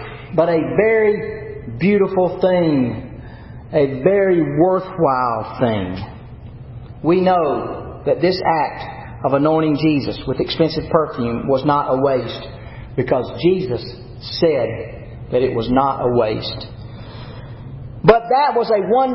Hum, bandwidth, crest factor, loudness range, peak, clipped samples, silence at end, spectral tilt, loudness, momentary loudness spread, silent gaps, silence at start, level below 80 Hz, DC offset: none; 5.8 kHz; 18 dB; 3 LU; 0 dBFS; under 0.1%; 0 s; -10 dB/octave; -18 LUFS; 19 LU; none; 0 s; -42 dBFS; under 0.1%